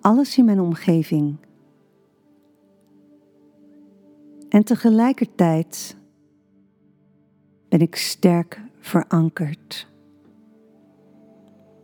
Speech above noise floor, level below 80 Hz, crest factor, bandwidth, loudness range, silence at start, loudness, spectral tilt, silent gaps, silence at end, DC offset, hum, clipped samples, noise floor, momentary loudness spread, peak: 41 dB; -76 dBFS; 22 dB; over 20 kHz; 6 LU; 0.05 s; -19 LUFS; -6.5 dB/octave; none; 2 s; under 0.1%; 50 Hz at -45 dBFS; under 0.1%; -59 dBFS; 16 LU; 0 dBFS